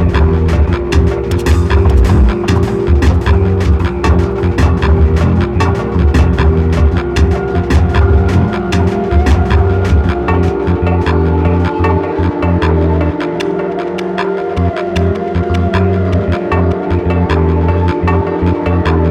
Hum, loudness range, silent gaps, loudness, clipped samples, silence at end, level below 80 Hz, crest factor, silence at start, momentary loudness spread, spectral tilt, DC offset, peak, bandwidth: none; 3 LU; none; -12 LUFS; under 0.1%; 0 s; -16 dBFS; 10 dB; 0 s; 4 LU; -8 dB/octave; under 0.1%; 0 dBFS; 9 kHz